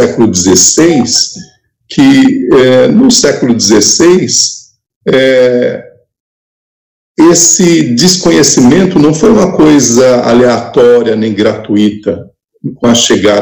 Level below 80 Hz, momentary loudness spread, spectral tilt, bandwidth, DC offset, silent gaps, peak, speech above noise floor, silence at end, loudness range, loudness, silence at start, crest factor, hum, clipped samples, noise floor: -40 dBFS; 9 LU; -3.5 dB/octave; over 20 kHz; under 0.1%; 4.96-5.01 s, 6.20-7.15 s; 0 dBFS; 32 dB; 0 s; 3 LU; -6 LUFS; 0 s; 8 dB; none; 8%; -38 dBFS